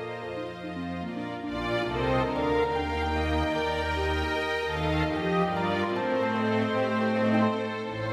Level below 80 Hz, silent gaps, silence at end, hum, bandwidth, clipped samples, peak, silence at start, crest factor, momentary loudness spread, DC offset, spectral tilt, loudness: -42 dBFS; none; 0 s; none; 14 kHz; under 0.1%; -14 dBFS; 0 s; 14 dB; 9 LU; under 0.1%; -6.5 dB/octave; -28 LUFS